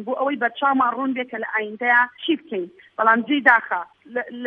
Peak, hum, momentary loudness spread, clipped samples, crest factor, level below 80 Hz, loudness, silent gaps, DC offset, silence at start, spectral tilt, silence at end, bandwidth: -2 dBFS; none; 14 LU; under 0.1%; 20 dB; -78 dBFS; -20 LUFS; none; under 0.1%; 0 s; -6 dB/octave; 0 s; 5.6 kHz